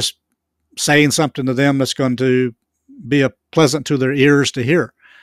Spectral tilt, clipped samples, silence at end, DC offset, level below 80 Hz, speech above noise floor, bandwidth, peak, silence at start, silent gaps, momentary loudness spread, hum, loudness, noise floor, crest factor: -4.5 dB/octave; under 0.1%; 0.35 s; under 0.1%; -56 dBFS; 57 dB; 15 kHz; 0 dBFS; 0 s; none; 8 LU; none; -16 LUFS; -72 dBFS; 16 dB